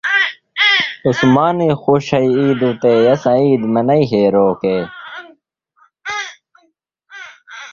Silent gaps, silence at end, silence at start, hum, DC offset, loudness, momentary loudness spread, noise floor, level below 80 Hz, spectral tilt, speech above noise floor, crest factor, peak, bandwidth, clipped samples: none; 0 s; 0.05 s; none; under 0.1%; -14 LUFS; 20 LU; -61 dBFS; -54 dBFS; -6 dB/octave; 48 dB; 14 dB; 0 dBFS; 7.4 kHz; under 0.1%